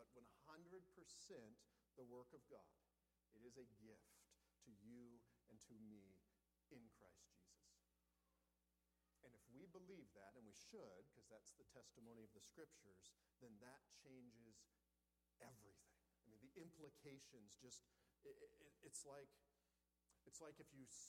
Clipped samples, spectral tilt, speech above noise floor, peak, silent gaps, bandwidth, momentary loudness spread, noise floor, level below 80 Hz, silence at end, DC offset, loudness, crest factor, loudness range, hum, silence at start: under 0.1%; -3.5 dB/octave; 24 dB; -42 dBFS; none; 15.5 kHz; 7 LU; -90 dBFS; -90 dBFS; 0 s; under 0.1%; -65 LUFS; 24 dB; 5 LU; none; 0 s